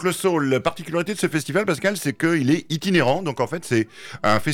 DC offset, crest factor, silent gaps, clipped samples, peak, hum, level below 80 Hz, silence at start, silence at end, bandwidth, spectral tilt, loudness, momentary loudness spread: under 0.1%; 14 dB; none; under 0.1%; -8 dBFS; none; -56 dBFS; 0 s; 0 s; 17.5 kHz; -5 dB/octave; -22 LUFS; 6 LU